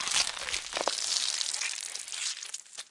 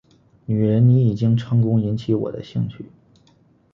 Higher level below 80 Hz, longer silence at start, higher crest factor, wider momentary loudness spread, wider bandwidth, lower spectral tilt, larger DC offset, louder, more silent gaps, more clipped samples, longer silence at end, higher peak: second, -66 dBFS vs -52 dBFS; second, 0 s vs 0.5 s; first, 26 dB vs 14 dB; second, 9 LU vs 12 LU; first, 11.5 kHz vs 5.8 kHz; second, 2 dB/octave vs -10.5 dB/octave; neither; second, -31 LUFS vs -20 LUFS; neither; neither; second, 0.05 s vs 0.9 s; about the same, -8 dBFS vs -6 dBFS